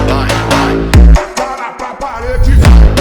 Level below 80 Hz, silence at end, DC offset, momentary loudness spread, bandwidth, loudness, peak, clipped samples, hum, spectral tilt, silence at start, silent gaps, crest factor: -10 dBFS; 0 s; under 0.1%; 14 LU; 13 kHz; -10 LUFS; 0 dBFS; 4%; none; -6 dB/octave; 0 s; none; 8 dB